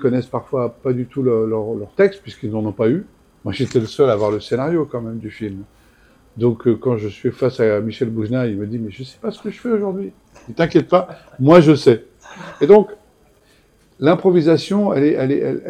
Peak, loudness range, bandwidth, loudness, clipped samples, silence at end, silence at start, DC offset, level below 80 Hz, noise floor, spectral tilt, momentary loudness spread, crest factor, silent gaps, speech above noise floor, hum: 0 dBFS; 6 LU; 9.8 kHz; -17 LUFS; under 0.1%; 0 s; 0 s; under 0.1%; -52 dBFS; -54 dBFS; -8 dB/octave; 16 LU; 18 dB; none; 37 dB; none